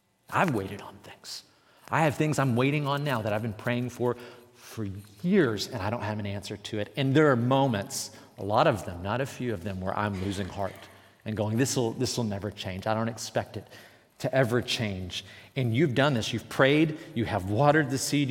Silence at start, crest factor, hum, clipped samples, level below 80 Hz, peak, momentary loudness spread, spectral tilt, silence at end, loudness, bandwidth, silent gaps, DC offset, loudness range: 0.3 s; 22 dB; none; under 0.1%; -66 dBFS; -6 dBFS; 15 LU; -5.5 dB/octave; 0 s; -28 LUFS; 17 kHz; none; under 0.1%; 4 LU